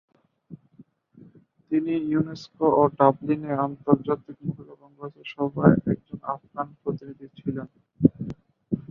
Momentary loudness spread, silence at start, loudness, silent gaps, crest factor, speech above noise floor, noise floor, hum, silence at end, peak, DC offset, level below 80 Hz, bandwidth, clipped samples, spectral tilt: 18 LU; 0.5 s; -25 LUFS; none; 24 dB; 31 dB; -55 dBFS; none; 0.1 s; -2 dBFS; under 0.1%; -56 dBFS; 6.6 kHz; under 0.1%; -9.5 dB/octave